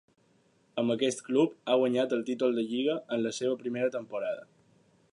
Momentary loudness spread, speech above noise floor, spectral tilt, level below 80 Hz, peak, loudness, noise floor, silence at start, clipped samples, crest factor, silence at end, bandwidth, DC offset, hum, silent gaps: 8 LU; 38 dB; -5 dB/octave; -82 dBFS; -14 dBFS; -30 LUFS; -67 dBFS; 0.75 s; under 0.1%; 16 dB; 0.7 s; 11 kHz; under 0.1%; none; none